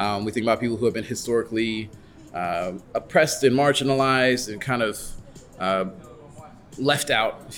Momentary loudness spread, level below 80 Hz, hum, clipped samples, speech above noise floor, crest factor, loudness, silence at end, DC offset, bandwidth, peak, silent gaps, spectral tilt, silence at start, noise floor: 13 LU; -50 dBFS; none; under 0.1%; 21 dB; 18 dB; -23 LUFS; 0 s; under 0.1%; 19 kHz; -6 dBFS; none; -4 dB/octave; 0 s; -45 dBFS